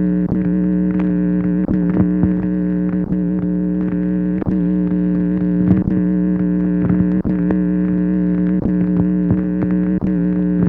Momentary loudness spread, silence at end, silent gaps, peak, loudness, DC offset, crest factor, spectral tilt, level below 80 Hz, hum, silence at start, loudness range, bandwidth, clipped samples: 3 LU; 0 s; none; -2 dBFS; -17 LUFS; under 0.1%; 14 dB; -13 dB/octave; -34 dBFS; none; 0 s; 1 LU; 2.9 kHz; under 0.1%